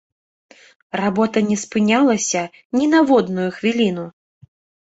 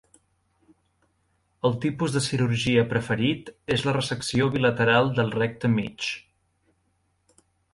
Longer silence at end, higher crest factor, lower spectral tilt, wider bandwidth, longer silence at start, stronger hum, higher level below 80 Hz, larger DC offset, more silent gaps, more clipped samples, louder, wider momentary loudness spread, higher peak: second, 0.75 s vs 1.55 s; about the same, 16 dB vs 20 dB; about the same, -4.5 dB/octave vs -5.5 dB/octave; second, 8.2 kHz vs 11.5 kHz; second, 0.95 s vs 1.65 s; neither; about the same, -60 dBFS vs -56 dBFS; neither; first, 2.65-2.70 s vs none; neither; first, -18 LUFS vs -24 LUFS; about the same, 9 LU vs 8 LU; about the same, -4 dBFS vs -6 dBFS